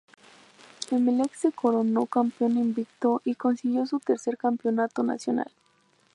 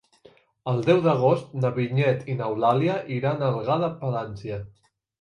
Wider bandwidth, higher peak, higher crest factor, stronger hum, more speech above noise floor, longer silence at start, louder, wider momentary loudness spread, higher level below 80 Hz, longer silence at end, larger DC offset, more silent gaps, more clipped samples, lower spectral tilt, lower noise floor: first, 11 kHz vs 9.4 kHz; about the same, -10 dBFS vs -8 dBFS; about the same, 16 dB vs 18 dB; neither; first, 39 dB vs 32 dB; first, 0.8 s vs 0.65 s; about the same, -26 LUFS vs -24 LUFS; second, 5 LU vs 13 LU; second, -80 dBFS vs -60 dBFS; first, 0.7 s vs 0.5 s; neither; neither; neither; second, -5.5 dB/octave vs -8.5 dB/octave; first, -65 dBFS vs -56 dBFS